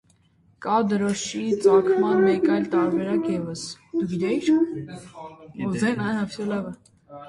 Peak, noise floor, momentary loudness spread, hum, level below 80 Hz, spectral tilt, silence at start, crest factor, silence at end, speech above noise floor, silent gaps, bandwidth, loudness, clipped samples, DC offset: -6 dBFS; -60 dBFS; 16 LU; none; -62 dBFS; -6 dB/octave; 0.6 s; 16 dB; 0 s; 38 dB; none; 11.5 kHz; -23 LUFS; under 0.1%; under 0.1%